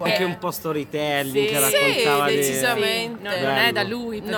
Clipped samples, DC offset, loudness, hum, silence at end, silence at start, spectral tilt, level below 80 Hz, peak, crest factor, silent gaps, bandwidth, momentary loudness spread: under 0.1%; under 0.1%; -21 LUFS; none; 0 s; 0 s; -3 dB/octave; -58 dBFS; -4 dBFS; 18 dB; none; 19 kHz; 9 LU